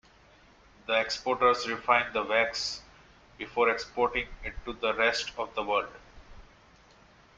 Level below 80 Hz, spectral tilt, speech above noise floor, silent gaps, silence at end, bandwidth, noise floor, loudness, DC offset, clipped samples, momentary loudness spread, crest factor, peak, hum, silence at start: -54 dBFS; -2.5 dB/octave; 29 dB; none; 0.95 s; 8.8 kHz; -58 dBFS; -28 LUFS; under 0.1%; under 0.1%; 13 LU; 24 dB; -8 dBFS; none; 0.9 s